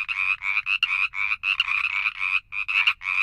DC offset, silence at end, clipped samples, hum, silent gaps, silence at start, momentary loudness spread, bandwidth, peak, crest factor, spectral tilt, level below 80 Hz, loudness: under 0.1%; 0 s; under 0.1%; none; none; 0 s; 3 LU; 12.5 kHz; -6 dBFS; 18 dB; 2 dB/octave; -58 dBFS; -22 LUFS